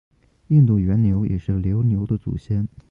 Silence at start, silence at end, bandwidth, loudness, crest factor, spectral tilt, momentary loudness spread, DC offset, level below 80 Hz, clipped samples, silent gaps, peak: 0.5 s; 0.25 s; 3.8 kHz; -20 LUFS; 14 dB; -12 dB/octave; 9 LU; under 0.1%; -36 dBFS; under 0.1%; none; -6 dBFS